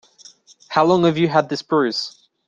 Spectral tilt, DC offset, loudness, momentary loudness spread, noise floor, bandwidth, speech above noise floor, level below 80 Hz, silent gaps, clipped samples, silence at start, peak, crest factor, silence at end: -6 dB/octave; under 0.1%; -18 LUFS; 9 LU; -48 dBFS; 7.6 kHz; 30 dB; -60 dBFS; none; under 0.1%; 0.7 s; -2 dBFS; 18 dB; 0.4 s